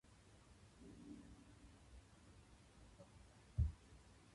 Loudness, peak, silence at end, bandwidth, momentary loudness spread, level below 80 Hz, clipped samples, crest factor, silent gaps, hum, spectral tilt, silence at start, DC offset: -50 LUFS; -28 dBFS; 0 s; 11.5 kHz; 22 LU; -54 dBFS; under 0.1%; 24 dB; none; none; -7 dB/octave; 0.05 s; under 0.1%